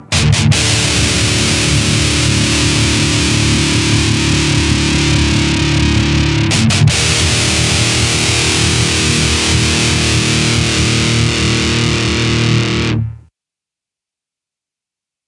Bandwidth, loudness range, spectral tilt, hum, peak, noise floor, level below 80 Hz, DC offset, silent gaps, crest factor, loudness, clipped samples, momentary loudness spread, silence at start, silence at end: 11.5 kHz; 3 LU; -3.5 dB/octave; none; 0 dBFS; -86 dBFS; -26 dBFS; under 0.1%; none; 12 dB; -12 LUFS; under 0.1%; 2 LU; 0 s; 2.1 s